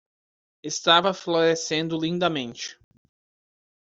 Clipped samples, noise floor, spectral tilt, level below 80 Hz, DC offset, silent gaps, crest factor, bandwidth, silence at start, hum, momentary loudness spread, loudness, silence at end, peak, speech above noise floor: under 0.1%; under -90 dBFS; -3.5 dB/octave; -68 dBFS; under 0.1%; none; 22 dB; 8 kHz; 0.65 s; none; 17 LU; -23 LUFS; 1.1 s; -4 dBFS; over 66 dB